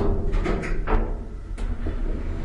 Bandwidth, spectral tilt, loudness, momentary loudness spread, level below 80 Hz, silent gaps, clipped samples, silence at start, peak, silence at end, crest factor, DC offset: 7.6 kHz; -7.5 dB/octave; -29 LUFS; 8 LU; -26 dBFS; none; under 0.1%; 0 s; -6 dBFS; 0 s; 16 dB; under 0.1%